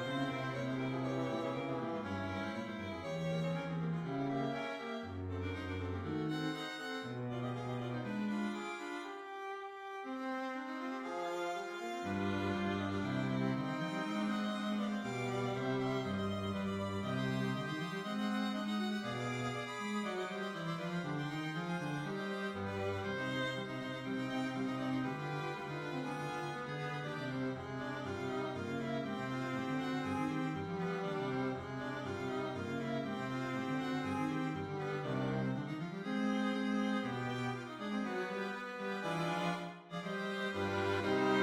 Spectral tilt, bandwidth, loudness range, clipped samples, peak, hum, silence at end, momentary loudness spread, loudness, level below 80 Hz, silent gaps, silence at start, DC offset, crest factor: -6 dB/octave; 15 kHz; 3 LU; under 0.1%; -20 dBFS; none; 0 s; 5 LU; -39 LUFS; -70 dBFS; none; 0 s; under 0.1%; 18 dB